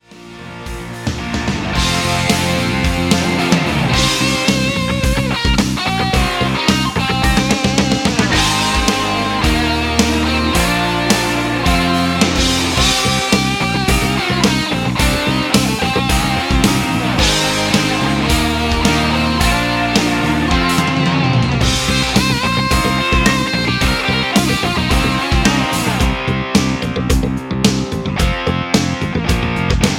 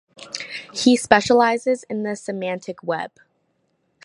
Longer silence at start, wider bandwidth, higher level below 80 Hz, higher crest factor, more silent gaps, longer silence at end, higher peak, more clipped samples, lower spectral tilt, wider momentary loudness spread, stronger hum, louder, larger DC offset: about the same, 0.1 s vs 0.2 s; first, 16.5 kHz vs 11.5 kHz; first, -24 dBFS vs -58 dBFS; second, 14 dB vs 22 dB; neither; second, 0 s vs 1 s; about the same, 0 dBFS vs 0 dBFS; neither; about the same, -4 dB/octave vs -3.5 dB/octave; second, 4 LU vs 15 LU; neither; first, -15 LUFS vs -20 LUFS; neither